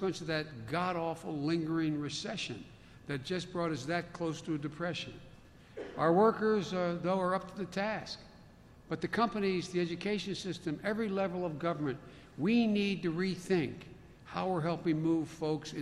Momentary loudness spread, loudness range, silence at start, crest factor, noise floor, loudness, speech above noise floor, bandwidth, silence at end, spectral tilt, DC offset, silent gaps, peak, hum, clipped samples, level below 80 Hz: 13 LU; 4 LU; 0 s; 18 dB; -57 dBFS; -34 LUFS; 23 dB; 12.5 kHz; 0 s; -6 dB/octave; under 0.1%; none; -16 dBFS; none; under 0.1%; -64 dBFS